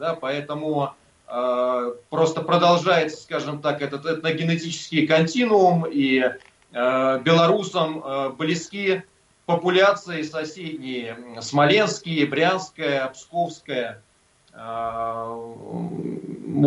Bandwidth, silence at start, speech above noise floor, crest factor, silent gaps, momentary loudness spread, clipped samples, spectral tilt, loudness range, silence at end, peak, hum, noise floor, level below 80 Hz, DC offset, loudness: 11 kHz; 0 s; 36 dB; 16 dB; none; 14 LU; under 0.1%; -5.5 dB/octave; 6 LU; 0 s; -6 dBFS; none; -59 dBFS; -66 dBFS; under 0.1%; -22 LUFS